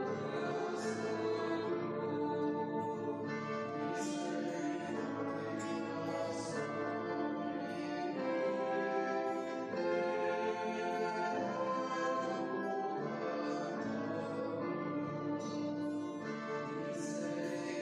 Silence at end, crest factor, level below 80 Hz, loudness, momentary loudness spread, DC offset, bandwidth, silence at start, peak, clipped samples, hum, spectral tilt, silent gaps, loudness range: 0 s; 14 dB; -80 dBFS; -38 LUFS; 4 LU; under 0.1%; 11.5 kHz; 0 s; -24 dBFS; under 0.1%; none; -5.5 dB/octave; none; 3 LU